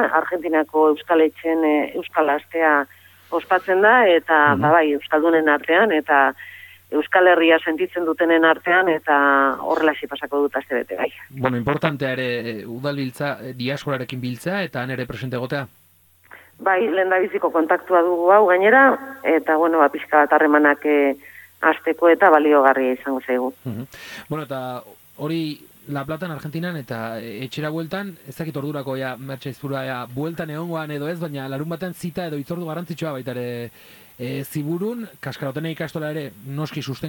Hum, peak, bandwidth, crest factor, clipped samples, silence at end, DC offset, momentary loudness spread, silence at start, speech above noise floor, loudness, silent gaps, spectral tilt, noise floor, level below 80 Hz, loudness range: none; -2 dBFS; 17.5 kHz; 18 dB; under 0.1%; 0 s; under 0.1%; 15 LU; 0 s; 36 dB; -20 LUFS; none; -6.5 dB/octave; -55 dBFS; -62 dBFS; 12 LU